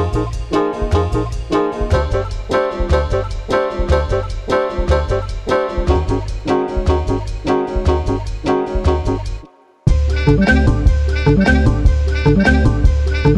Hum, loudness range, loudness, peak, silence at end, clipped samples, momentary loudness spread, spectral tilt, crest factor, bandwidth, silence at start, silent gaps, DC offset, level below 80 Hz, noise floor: none; 4 LU; -17 LUFS; 0 dBFS; 0 s; under 0.1%; 8 LU; -7.5 dB/octave; 14 dB; 9.8 kHz; 0 s; none; under 0.1%; -18 dBFS; -37 dBFS